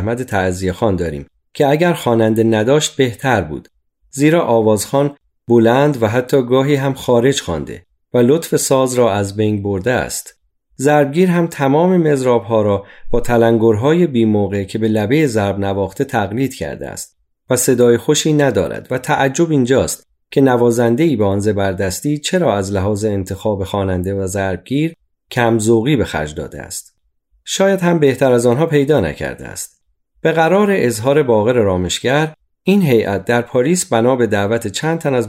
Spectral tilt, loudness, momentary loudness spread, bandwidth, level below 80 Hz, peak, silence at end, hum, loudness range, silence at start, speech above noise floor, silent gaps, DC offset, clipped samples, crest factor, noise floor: -5.5 dB/octave; -15 LUFS; 10 LU; 16 kHz; -42 dBFS; -2 dBFS; 0 s; none; 3 LU; 0 s; 46 dB; none; under 0.1%; under 0.1%; 14 dB; -60 dBFS